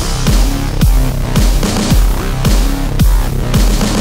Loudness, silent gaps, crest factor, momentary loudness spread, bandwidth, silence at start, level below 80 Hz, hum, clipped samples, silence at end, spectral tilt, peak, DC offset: -14 LUFS; none; 10 dB; 3 LU; 16.5 kHz; 0 s; -12 dBFS; none; under 0.1%; 0 s; -5 dB/octave; 0 dBFS; under 0.1%